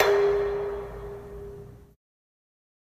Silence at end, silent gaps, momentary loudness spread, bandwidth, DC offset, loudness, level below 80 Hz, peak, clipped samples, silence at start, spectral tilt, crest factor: 1.15 s; none; 21 LU; 15 kHz; under 0.1%; -26 LUFS; -48 dBFS; -4 dBFS; under 0.1%; 0 s; -5 dB/octave; 24 dB